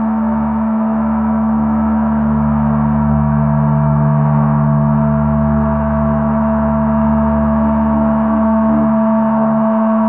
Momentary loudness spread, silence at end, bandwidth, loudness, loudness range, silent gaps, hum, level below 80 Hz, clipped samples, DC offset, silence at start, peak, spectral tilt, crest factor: 2 LU; 0 s; 3 kHz; -14 LUFS; 1 LU; none; none; -28 dBFS; under 0.1%; 0.2%; 0 s; -2 dBFS; -15 dB/octave; 10 dB